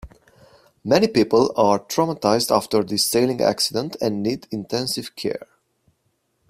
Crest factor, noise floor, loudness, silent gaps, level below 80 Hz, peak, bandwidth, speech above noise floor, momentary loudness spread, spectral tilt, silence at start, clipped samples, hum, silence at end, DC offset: 20 dB; -69 dBFS; -20 LUFS; none; -54 dBFS; -2 dBFS; 16 kHz; 49 dB; 11 LU; -4 dB/octave; 0.05 s; under 0.1%; none; 1.05 s; under 0.1%